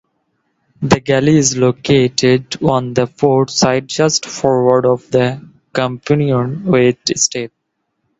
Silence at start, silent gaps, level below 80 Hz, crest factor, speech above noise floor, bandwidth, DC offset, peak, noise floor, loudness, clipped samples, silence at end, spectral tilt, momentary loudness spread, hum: 0.8 s; none; -48 dBFS; 14 dB; 56 dB; 8.2 kHz; under 0.1%; 0 dBFS; -70 dBFS; -14 LUFS; under 0.1%; 0.7 s; -4.5 dB/octave; 7 LU; none